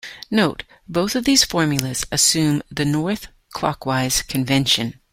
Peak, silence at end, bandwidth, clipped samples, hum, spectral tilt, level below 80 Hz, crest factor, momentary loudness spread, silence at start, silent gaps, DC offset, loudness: 0 dBFS; 0.2 s; 16.5 kHz; under 0.1%; none; -3.5 dB/octave; -46 dBFS; 20 dB; 10 LU; 0.05 s; none; under 0.1%; -19 LUFS